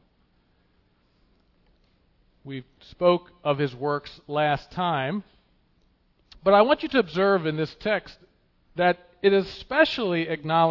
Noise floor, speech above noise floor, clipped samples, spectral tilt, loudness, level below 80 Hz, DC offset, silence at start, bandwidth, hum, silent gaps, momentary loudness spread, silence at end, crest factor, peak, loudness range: -65 dBFS; 41 dB; under 0.1%; -7 dB/octave; -24 LUFS; -58 dBFS; under 0.1%; 2.45 s; 6 kHz; none; none; 11 LU; 0 s; 20 dB; -6 dBFS; 6 LU